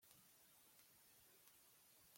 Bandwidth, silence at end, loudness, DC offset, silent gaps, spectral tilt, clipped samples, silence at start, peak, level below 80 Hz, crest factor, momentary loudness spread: 16.5 kHz; 0 s; -68 LUFS; under 0.1%; none; -1 dB/octave; under 0.1%; 0 s; -40 dBFS; under -90 dBFS; 30 dB; 1 LU